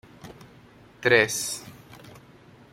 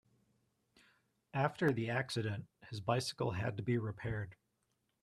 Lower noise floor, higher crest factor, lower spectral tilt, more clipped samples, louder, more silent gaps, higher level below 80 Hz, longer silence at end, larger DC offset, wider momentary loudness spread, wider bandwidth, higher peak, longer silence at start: second, -52 dBFS vs -82 dBFS; first, 26 dB vs 20 dB; second, -2.5 dB/octave vs -6 dB/octave; neither; first, -23 LUFS vs -38 LUFS; neither; first, -62 dBFS vs -68 dBFS; second, 0.55 s vs 0.7 s; neither; first, 27 LU vs 10 LU; first, 16.5 kHz vs 13 kHz; first, -4 dBFS vs -18 dBFS; second, 0.25 s vs 1.35 s